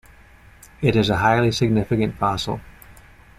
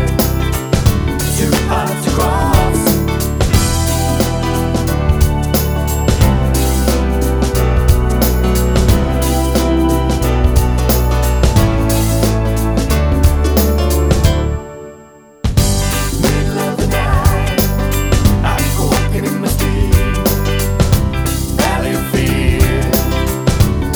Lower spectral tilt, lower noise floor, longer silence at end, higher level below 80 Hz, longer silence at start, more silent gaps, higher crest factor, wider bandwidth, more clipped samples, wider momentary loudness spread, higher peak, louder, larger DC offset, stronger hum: about the same, -6 dB/octave vs -5.5 dB/octave; first, -48 dBFS vs -39 dBFS; first, 0.45 s vs 0 s; second, -44 dBFS vs -16 dBFS; first, 0.8 s vs 0 s; neither; first, 18 dB vs 12 dB; second, 15 kHz vs over 20 kHz; neither; first, 9 LU vs 4 LU; second, -4 dBFS vs 0 dBFS; second, -20 LUFS vs -14 LUFS; neither; neither